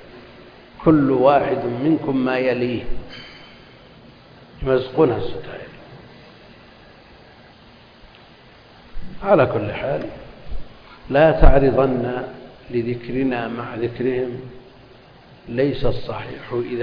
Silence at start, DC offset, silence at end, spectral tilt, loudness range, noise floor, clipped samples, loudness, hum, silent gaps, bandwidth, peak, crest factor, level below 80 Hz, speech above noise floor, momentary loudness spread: 0 s; under 0.1%; 0 s; -9.5 dB/octave; 6 LU; -47 dBFS; under 0.1%; -20 LUFS; none; none; 5.2 kHz; 0 dBFS; 20 dB; -28 dBFS; 29 dB; 24 LU